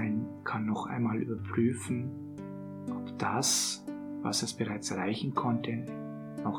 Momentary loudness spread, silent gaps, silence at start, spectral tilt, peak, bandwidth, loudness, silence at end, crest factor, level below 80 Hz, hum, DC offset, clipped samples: 12 LU; none; 0 s; -4 dB/octave; -14 dBFS; 18 kHz; -33 LUFS; 0 s; 18 dB; -72 dBFS; none; under 0.1%; under 0.1%